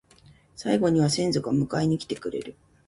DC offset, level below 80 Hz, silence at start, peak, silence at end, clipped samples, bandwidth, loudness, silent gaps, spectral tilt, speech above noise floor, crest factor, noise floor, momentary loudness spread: under 0.1%; -56 dBFS; 0.6 s; -8 dBFS; 0.35 s; under 0.1%; 11.5 kHz; -25 LUFS; none; -6 dB/octave; 31 dB; 18 dB; -56 dBFS; 13 LU